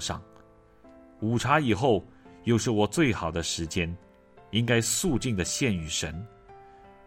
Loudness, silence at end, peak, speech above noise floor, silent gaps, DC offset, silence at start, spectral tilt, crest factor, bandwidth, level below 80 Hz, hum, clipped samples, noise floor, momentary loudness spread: -27 LUFS; 0.15 s; -8 dBFS; 29 dB; none; under 0.1%; 0 s; -4.5 dB/octave; 20 dB; 16 kHz; -50 dBFS; none; under 0.1%; -55 dBFS; 11 LU